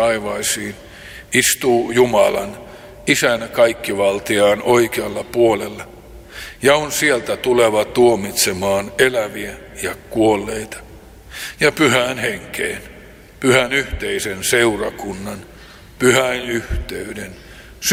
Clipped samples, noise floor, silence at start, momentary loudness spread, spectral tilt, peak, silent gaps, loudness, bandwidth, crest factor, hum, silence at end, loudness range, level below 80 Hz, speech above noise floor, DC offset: under 0.1%; -40 dBFS; 0 s; 16 LU; -3.5 dB/octave; 0 dBFS; none; -17 LUFS; 16.5 kHz; 18 dB; none; 0 s; 3 LU; -40 dBFS; 23 dB; under 0.1%